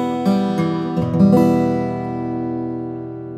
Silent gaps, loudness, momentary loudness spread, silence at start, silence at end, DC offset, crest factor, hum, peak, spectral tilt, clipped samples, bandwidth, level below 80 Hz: none; -18 LUFS; 12 LU; 0 s; 0 s; under 0.1%; 16 dB; none; -2 dBFS; -8.5 dB/octave; under 0.1%; 13 kHz; -52 dBFS